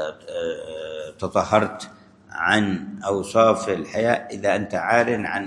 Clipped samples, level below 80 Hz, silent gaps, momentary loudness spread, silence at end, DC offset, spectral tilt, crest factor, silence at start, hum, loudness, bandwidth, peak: under 0.1%; -60 dBFS; none; 14 LU; 0 s; under 0.1%; -5 dB/octave; 22 dB; 0 s; none; -22 LUFS; 12 kHz; -2 dBFS